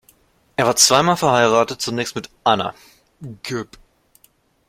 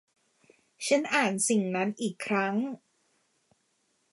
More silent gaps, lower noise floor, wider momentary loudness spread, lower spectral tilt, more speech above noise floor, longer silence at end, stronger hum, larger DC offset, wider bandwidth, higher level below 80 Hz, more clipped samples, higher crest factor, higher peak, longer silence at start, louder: neither; second, -58 dBFS vs -73 dBFS; first, 20 LU vs 11 LU; about the same, -2.5 dB/octave vs -3.5 dB/octave; second, 40 dB vs 45 dB; second, 1.05 s vs 1.35 s; neither; neither; first, 16.5 kHz vs 11.5 kHz; first, -56 dBFS vs -82 dBFS; neither; about the same, 20 dB vs 20 dB; first, 0 dBFS vs -12 dBFS; second, 0.6 s vs 0.8 s; first, -17 LUFS vs -28 LUFS